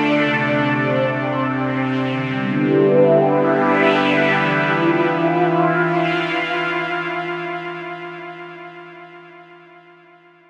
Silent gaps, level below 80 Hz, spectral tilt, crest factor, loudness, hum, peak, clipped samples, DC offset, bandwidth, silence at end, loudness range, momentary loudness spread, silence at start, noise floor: none; -64 dBFS; -7.5 dB/octave; 18 dB; -18 LUFS; none; -2 dBFS; under 0.1%; under 0.1%; 8.6 kHz; 0.95 s; 11 LU; 16 LU; 0 s; -48 dBFS